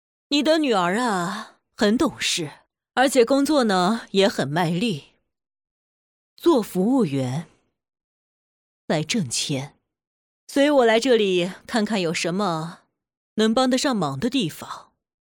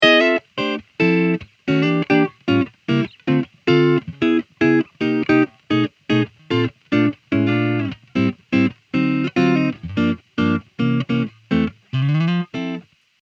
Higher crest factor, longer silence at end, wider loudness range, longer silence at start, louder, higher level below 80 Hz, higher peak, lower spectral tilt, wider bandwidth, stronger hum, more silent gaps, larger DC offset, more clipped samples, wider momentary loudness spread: about the same, 16 dB vs 18 dB; about the same, 0.5 s vs 0.45 s; first, 5 LU vs 2 LU; first, 0.3 s vs 0 s; about the same, -21 LUFS vs -19 LUFS; second, -62 dBFS vs -54 dBFS; second, -6 dBFS vs 0 dBFS; second, -4.5 dB/octave vs -7.5 dB/octave; first, 19 kHz vs 7.4 kHz; neither; first, 5.71-6.37 s, 8.04-8.88 s, 10.07-10.47 s, 13.17-13.36 s vs none; neither; neither; first, 12 LU vs 6 LU